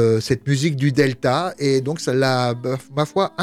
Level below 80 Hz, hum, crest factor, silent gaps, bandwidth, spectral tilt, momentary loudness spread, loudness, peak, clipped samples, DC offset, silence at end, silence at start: -54 dBFS; none; 16 dB; none; 14.5 kHz; -6 dB/octave; 4 LU; -20 LUFS; -4 dBFS; under 0.1%; under 0.1%; 0 s; 0 s